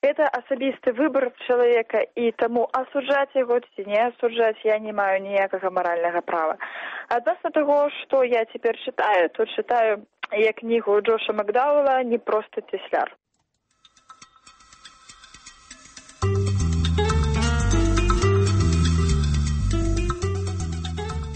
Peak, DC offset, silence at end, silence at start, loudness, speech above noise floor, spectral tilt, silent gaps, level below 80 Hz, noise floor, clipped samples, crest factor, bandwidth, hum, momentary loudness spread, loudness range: -6 dBFS; under 0.1%; 0 s; 0.05 s; -23 LUFS; 50 dB; -6 dB/octave; none; -32 dBFS; -72 dBFS; under 0.1%; 16 dB; 8.8 kHz; none; 7 LU; 7 LU